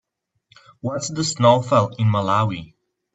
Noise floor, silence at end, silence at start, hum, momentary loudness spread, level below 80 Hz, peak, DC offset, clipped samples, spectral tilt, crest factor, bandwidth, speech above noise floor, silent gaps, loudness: -70 dBFS; 0.5 s; 0.85 s; none; 12 LU; -60 dBFS; -2 dBFS; under 0.1%; under 0.1%; -5.5 dB/octave; 18 dB; 9 kHz; 51 dB; none; -19 LUFS